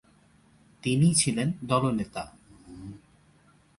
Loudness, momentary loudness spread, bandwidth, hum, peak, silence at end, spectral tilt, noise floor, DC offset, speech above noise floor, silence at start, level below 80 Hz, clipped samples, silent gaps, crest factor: -26 LUFS; 22 LU; 11.5 kHz; none; -10 dBFS; 0.8 s; -5 dB/octave; -61 dBFS; under 0.1%; 35 dB; 0.85 s; -56 dBFS; under 0.1%; none; 20 dB